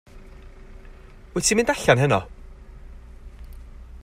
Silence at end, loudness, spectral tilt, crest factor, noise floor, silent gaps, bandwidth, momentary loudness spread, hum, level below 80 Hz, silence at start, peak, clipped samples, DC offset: 0.05 s; -20 LUFS; -4 dB/octave; 22 dB; -44 dBFS; none; 16 kHz; 26 LU; none; -42 dBFS; 0.15 s; -4 dBFS; under 0.1%; under 0.1%